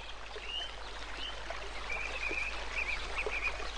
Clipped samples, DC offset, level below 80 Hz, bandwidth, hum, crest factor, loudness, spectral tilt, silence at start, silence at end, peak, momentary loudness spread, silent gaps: under 0.1%; 0.6%; -46 dBFS; 10 kHz; none; 16 dB; -37 LUFS; -2.5 dB/octave; 0 s; 0 s; -22 dBFS; 8 LU; none